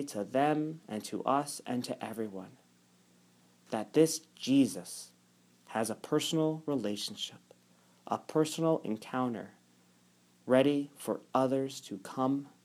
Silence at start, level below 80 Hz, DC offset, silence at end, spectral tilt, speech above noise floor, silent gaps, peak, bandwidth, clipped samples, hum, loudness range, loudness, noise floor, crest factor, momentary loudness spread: 0 s; -84 dBFS; under 0.1%; 0.15 s; -5 dB/octave; 34 dB; none; -12 dBFS; 16 kHz; under 0.1%; 60 Hz at -65 dBFS; 4 LU; -33 LUFS; -66 dBFS; 22 dB; 13 LU